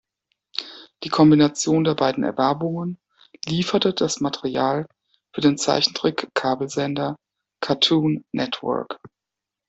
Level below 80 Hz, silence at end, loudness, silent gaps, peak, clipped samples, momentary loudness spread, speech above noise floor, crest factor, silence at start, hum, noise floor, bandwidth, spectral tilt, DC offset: -60 dBFS; 0.6 s; -21 LUFS; none; -4 dBFS; under 0.1%; 16 LU; 65 dB; 18 dB; 0.6 s; none; -86 dBFS; 8.2 kHz; -5 dB/octave; under 0.1%